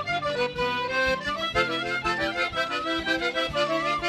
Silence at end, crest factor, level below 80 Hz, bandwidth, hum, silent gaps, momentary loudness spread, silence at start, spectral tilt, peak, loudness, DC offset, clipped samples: 0 s; 16 dB; -50 dBFS; 14 kHz; none; none; 2 LU; 0 s; -3.5 dB/octave; -10 dBFS; -26 LUFS; under 0.1%; under 0.1%